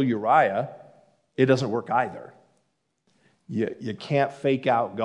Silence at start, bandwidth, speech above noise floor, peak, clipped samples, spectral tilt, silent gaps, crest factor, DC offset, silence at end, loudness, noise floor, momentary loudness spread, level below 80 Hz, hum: 0 s; 10.5 kHz; 49 dB; -6 dBFS; under 0.1%; -7 dB/octave; none; 20 dB; under 0.1%; 0 s; -24 LUFS; -73 dBFS; 14 LU; -76 dBFS; none